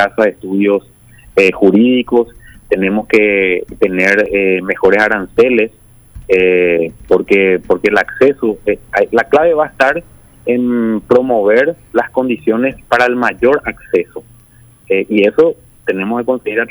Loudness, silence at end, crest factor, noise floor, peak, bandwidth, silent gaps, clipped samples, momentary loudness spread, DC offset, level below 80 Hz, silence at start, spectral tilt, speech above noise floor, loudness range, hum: -13 LUFS; 0.05 s; 12 dB; -43 dBFS; 0 dBFS; over 20 kHz; none; under 0.1%; 7 LU; under 0.1%; -44 dBFS; 0 s; -6.5 dB/octave; 31 dB; 3 LU; none